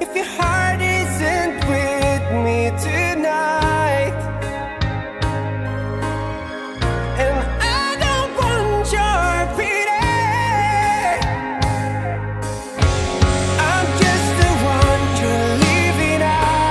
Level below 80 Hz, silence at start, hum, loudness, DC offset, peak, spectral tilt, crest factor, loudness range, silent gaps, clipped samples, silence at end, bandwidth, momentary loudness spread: -30 dBFS; 0 s; none; -18 LUFS; under 0.1%; -2 dBFS; -5 dB/octave; 16 dB; 5 LU; none; under 0.1%; 0 s; 12 kHz; 8 LU